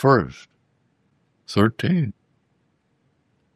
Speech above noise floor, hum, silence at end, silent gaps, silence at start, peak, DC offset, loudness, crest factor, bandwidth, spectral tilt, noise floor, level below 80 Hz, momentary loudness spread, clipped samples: 48 dB; none; 1.45 s; none; 0 s; -2 dBFS; under 0.1%; -22 LUFS; 22 dB; 13 kHz; -7.5 dB/octave; -67 dBFS; -58 dBFS; 13 LU; under 0.1%